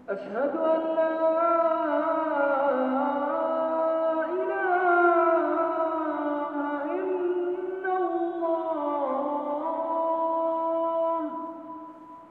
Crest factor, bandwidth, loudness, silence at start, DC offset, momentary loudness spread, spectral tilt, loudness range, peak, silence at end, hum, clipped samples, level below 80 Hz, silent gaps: 16 dB; 4.5 kHz; -26 LUFS; 0 s; under 0.1%; 7 LU; -7.5 dB/octave; 4 LU; -10 dBFS; 0 s; none; under 0.1%; -78 dBFS; none